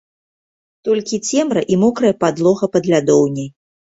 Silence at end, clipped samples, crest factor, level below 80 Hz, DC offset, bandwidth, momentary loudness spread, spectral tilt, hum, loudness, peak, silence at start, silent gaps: 0.5 s; under 0.1%; 16 dB; -56 dBFS; under 0.1%; 8 kHz; 7 LU; -5.5 dB/octave; none; -16 LUFS; -2 dBFS; 0.85 s; none